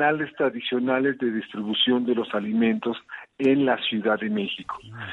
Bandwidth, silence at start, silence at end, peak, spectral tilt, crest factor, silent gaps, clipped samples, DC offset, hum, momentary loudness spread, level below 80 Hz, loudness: 4.2 kHz; 0 s; 0 s; -8 dBFS; -7 dB/octave; 16 dB; none; under 0.1%; under 0.1%; none; 10 LU; -68 dBFS; -24 LUFS